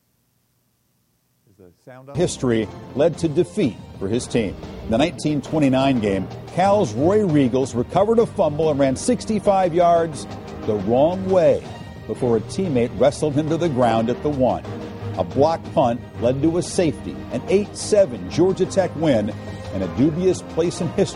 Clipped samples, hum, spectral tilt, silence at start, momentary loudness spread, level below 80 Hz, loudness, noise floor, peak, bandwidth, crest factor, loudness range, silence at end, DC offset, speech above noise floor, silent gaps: under 0.1%; none; -6.5 dB/octave; 1.85 s; 11 LU; -44 dBFS; -20 LUFS; -66 dBFS; -4 dBFS; 11.5 kHz; 16 dB; 4 LU; 0 s; under 0.1%; 46 dB; none